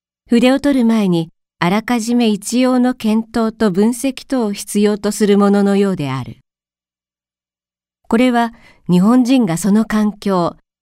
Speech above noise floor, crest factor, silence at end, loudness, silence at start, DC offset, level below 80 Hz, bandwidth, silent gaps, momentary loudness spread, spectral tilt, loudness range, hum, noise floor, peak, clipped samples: over 76 dB; 16 dB; 0.3 s; -15 LUFS; 0.3 s; under 0.1%; -48 dBFS; 16 kHz; none; 8 LU; -6 dB/octave; 3 LU; none; under -90 dBFS; 0 dBFS; under 0.1%